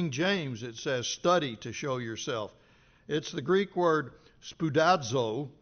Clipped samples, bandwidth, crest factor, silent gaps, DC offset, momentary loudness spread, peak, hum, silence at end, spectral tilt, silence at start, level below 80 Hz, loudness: under 0.1%; 6.8 kHz; 18 dB; none; under 0.1%; 11 LU; -12 dBFS; none; 0.1 s; -4 dB/octave; 0 s; -68 dBFS; -30 LUFS